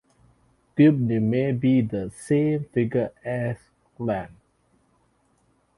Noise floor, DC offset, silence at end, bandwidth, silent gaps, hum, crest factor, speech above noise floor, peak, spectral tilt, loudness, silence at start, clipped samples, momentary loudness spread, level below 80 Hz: -65 dBFS; under 0.1%; 1.5 s; 11.5 kHz; none; none; 18 dB; 43 dB; -6 dBFS; -8.5 dB/octave; -24 LUFS; 0.75 s; under 0.1%; 13 LU; -58 dBFS